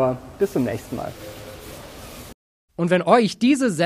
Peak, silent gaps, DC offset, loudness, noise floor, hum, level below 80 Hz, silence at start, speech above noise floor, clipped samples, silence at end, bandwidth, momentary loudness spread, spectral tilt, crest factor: -2 dBFS; 2.34-2.68 s; under 0.1%; -21 LUFS; -39 dBFS; none; -50 dBFS; 0 s; 18 dB; under 0.1%; 0 s; 15.5 kHz; 22 LU; -5.5 dB/octave; 20 dB